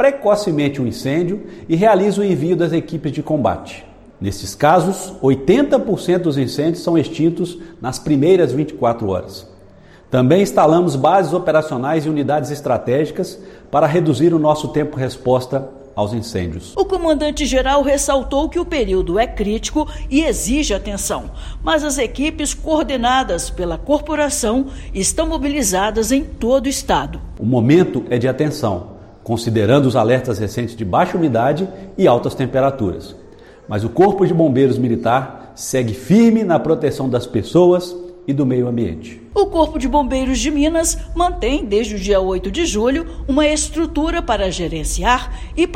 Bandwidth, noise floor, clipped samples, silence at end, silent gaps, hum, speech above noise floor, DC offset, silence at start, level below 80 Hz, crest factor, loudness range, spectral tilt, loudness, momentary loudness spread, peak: 16.5 kHz; -43 dBFS; under 0.1%; 0 s; none; none; 27 dB; under 0.1%; 0 s; -32 dBFS; 16 dB; 3 LU; -5.5 dB/octave; -17 LUFS; 10 LU; 0 dBFS